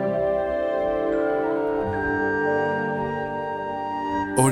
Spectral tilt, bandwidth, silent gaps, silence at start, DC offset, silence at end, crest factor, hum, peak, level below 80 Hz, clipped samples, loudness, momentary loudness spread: -5.5 dB/octave; 16 kHz; none; 0 s; under 0.1%; 0 s; 18 dB; none; -4 dBFS; -48 dBFS; under 0.1%; -24 LUFS; 6 LU